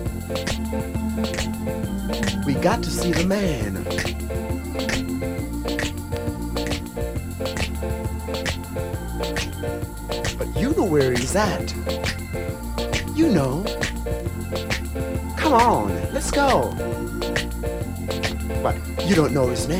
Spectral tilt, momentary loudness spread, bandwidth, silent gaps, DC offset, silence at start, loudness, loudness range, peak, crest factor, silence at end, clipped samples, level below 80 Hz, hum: -5 dB/octave; 9 LU; 16.5 kHz; none; under 0.1%; 0 s; -24 LUFS; 5 LU; -4 dBFS; 18 dB; 0 s; under 0.1%; -32 dBFS; none